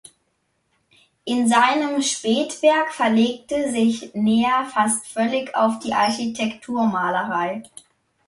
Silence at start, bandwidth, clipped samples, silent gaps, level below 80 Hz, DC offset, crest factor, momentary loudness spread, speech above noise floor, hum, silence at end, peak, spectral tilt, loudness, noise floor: 1.25 s; 11.5 kHz; under 0.1%; none; -62 dBFS; under 0.1%; 18 dB; 7 LU; 50 dB; none; 0.65 s; -4 dBFS; -3.5 dB/octave; -20 LUFS; -70 dBFS